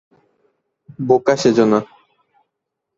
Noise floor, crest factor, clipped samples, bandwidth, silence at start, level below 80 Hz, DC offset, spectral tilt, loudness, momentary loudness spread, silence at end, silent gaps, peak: -78 dBFS; 18 dB; under 0.1%; 7.8 kHz; 1 s; -60 dBFS; under 0.1%; -5.5 dB/octave; -16 LUFS; 14 LU; 1.15 s; none; -2 dBFS